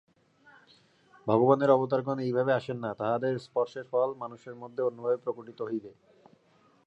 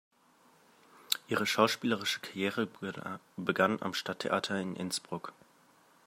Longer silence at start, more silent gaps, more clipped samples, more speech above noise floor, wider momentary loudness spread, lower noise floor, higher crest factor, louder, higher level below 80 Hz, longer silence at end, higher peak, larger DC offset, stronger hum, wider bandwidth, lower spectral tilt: first, 1.25 s vs 1.1 s; neither; neither; first, 36 dB vs 32 dB; about the same, 15 LU vs 13 LU; about the same, -64 dBFS vs -65 dBFS; second, 22 dB vs 28 dB; first, -29 LUFS vs -33 LUFS; about the same, -76 dBFS vs -80 dBFS; first, 0.95 s vs 0.75 s; about the same, -8 dBFS vs -8 dBFS; neither; neither; second, 8.2 kHz vs 16 kHz; first, -8.5 dB/octave vs -3.5 dB/octave